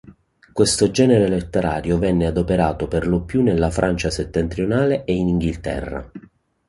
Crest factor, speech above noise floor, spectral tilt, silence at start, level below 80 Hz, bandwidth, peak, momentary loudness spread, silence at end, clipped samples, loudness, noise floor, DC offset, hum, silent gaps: 18 dB; 29 dB; -6 dB/octave; 0.05 s; -34 dBFS; 11.5 kHz; -2 dBFS; 10 LU; 0.5 s; under 0.1%; -19 LUFS; -48 dBFS; under 0.1%; none; none